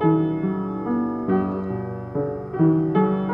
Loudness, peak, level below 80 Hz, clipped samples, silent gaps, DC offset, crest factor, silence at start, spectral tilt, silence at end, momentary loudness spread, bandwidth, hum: -23 LUFS; -6 dBFS; -52 dBFS; under 0.1%; none; under 0.1%; 16 dB; 0 s; -11.5 dB/octave; 0 s; 8 LU; 3.7 kHz; none